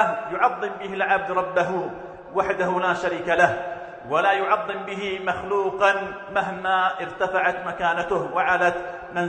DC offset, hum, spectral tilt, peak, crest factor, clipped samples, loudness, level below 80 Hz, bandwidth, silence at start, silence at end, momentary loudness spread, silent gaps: under 0.1%; none; -5 dB/octave; -2 dBFS; 22 dB; under 0.1%; -23 LUFS; -58 dBFS; 9.2 kHz; 0 s; 0 s; 9 LU; none